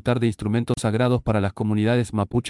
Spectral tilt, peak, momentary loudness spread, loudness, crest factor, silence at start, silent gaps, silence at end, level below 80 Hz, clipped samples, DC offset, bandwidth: -7 dB/octave; -8 dBFS; 3 LU; -22 LUFS; 14 dB; 0.05 s; none; 0 s; -44 dBFS; under 0.1%; under 0.1%; 12 kHz